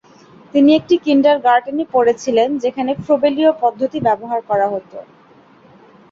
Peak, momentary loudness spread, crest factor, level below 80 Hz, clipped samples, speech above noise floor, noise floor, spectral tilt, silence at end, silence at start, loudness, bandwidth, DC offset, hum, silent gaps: -2 dBFS; 8 LU; 14 dB; -58 dBFS; under 0.1%; 32 dB; -47 dBFS; -5.5 dB/octave; 1.1 s; 0.55 s; -15 LUFS; 7.6 kHz; under 0.1%; none; none